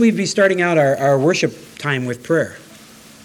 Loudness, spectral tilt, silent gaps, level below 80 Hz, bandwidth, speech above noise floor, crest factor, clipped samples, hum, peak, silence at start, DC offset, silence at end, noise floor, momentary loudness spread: -17 LUFS; -5 dB/octave; none; -62 dBFS; 17.5 kHz; 26 dB; 16 dB; under 0.1%; none; -2 dBFS; 0 s; under 0.1%; 0.65 s; -42 dBFS; 8 LU